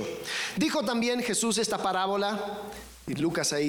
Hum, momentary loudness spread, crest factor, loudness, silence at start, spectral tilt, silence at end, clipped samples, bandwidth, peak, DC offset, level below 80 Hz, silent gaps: none; 11 LU; 14 dB; -28 LUFS; 0 s; -3 dB/octave; 0 s; under 0.1%; 19.5 kHz; -16 dBFS; under 0.1%; -60 dBFS; none